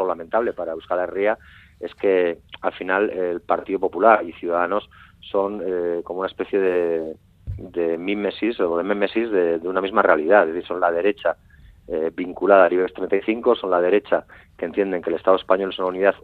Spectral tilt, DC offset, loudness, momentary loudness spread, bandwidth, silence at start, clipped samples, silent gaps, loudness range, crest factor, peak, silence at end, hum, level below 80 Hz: -8 dB/octave; under 0.1%; -21 LUFS; 11 LU; 4.6 kHz; 0 s; under 0.1%; none; 4 LU; 20 dB; 0 dBFS; 0.05 s; none; -52 dBFS